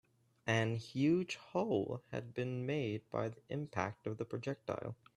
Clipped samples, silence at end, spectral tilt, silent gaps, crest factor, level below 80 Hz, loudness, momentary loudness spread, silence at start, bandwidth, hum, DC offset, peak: under 0.1%; 0.25 s; -6.5 dB/octave; none; 22 dB; -74 dBFS; -39 LUFS; 10 LU; 0.45 s; 11.5 kHz; none; under 0.1%; -18 dBFS